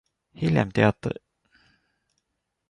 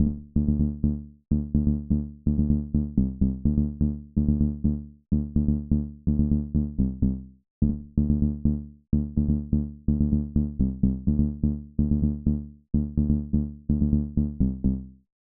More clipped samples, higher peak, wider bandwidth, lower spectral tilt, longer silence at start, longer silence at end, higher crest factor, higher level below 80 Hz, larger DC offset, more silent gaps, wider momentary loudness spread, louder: neither; about the same, -6 dBFS vs -8 dBFS; first, 10.5 kHz vs 1.3 kHz; second, -8 dB/octave vs -17 dB/octave; first, 0.4 s vs 0 s; first, 1.55 s vs 0.3 s; first, 22 dB vs 16 dB; second, -54 dBFS vs -30 dBFS; neither; second, none vs 7.50-7.61 s; first, 12 LU vs 4 LU; about the same, -24 LUFS vs -26 LUFS